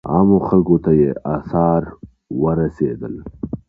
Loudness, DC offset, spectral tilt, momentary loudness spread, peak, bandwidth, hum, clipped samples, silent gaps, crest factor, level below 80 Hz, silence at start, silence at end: -17 LUFS; under 0.1%; -13 dB/octave; 15 LU; -2 dBFS; 2.8 kHz; none; under 0.1%; none; 16 dB; -40 dBFS; 0.05 s; 0.1 s